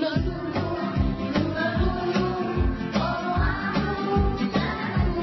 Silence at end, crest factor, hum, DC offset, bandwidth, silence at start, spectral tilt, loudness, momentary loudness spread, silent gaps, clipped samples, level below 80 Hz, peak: 0 s; 14 dB; none; under 0.1%; 6 kHz; 0 s; -7.5 dB/octave; -26 LUFS; 3 LU; none; under 0.1%; -32 dBFS; -10 dBFS